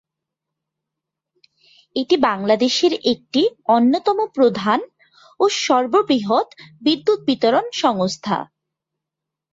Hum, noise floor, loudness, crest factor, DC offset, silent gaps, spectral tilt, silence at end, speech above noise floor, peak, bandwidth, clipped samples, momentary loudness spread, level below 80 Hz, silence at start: none; -84 dBFS; -18 LUFS; 16 dB; under 0.1%; none; -4.5 dB/octave; 1.05 s; 66 dB; -2 dBFS; 7.8 kHz; under 0.1%; 7 LU; -64 dBFS; 1.95 s